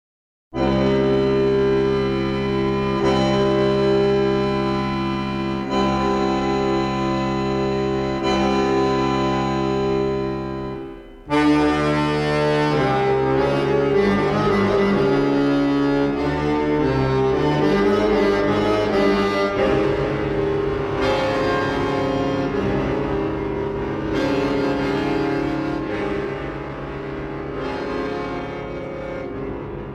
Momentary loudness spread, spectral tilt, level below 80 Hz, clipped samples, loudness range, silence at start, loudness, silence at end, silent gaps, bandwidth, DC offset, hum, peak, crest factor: 10 LU; -7 dB/octave; -38 dBFS; under 0.1%; 5 LU; 0.5 s; -20 LUFS; 0 s; none; 11 kHz; under 0.1%; none; -6 dBFS; 14 dB